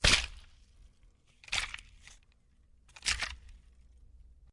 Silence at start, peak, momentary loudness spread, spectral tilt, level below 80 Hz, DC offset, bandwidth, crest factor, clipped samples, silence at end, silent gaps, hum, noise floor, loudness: 0 s; -8 dBFS; 28 LU; -1 dB/octave; -46 dBFS; under 0.1%; 11.5 kHz; 28 dB; under 0.1%; 0.95 s; none; none; -65 dBFS; -33 LUFS